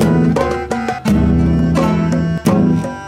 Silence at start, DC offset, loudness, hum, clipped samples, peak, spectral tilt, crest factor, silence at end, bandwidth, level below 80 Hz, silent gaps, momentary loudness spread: 0 s; under 0.1%; -15 LUFS; none; under 0.1%; -2 dBFS; -7.5 dB/octave; 12 dB; 0 s; 14 kHz; -28 dBFS; none; 5 LU